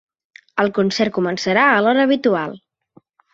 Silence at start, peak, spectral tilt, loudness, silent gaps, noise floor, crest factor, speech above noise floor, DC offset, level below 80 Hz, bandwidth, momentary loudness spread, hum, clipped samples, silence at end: 0.55 s; -2 dBFS; -5 dB/octave; -17 LUFS; none; -54 dBFS; 18 dB; 38 dB; under 0.1%; -62 dBFS; 7.8 kHz; 9 LU; none; under 0.1%; 0.75 s